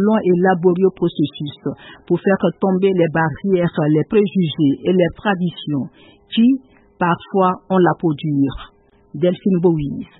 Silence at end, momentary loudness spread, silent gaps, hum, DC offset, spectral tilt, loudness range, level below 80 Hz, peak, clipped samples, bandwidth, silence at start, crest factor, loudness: 0.15 s; 9 LU; none; none; under 0.1%; -12.5 dB/octave; 2 LU; -48 dBFS; -2 dBFS; under 0.1%; 4.1 kHz; 0 s; 14 dB; -17 LUFS